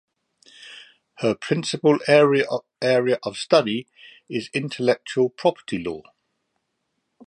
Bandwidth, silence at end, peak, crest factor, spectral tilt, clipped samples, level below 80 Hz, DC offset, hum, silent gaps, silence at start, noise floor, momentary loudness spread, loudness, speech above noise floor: 11 kHz; 1.25 s; -2 dBFS; 20 dB; -5 dB/octave; under 0.1%; -64 dBFS; under 0.1%; none; none; 0.6 s; -76 dBFS; 15 LU; -22 LUFS; 54 dB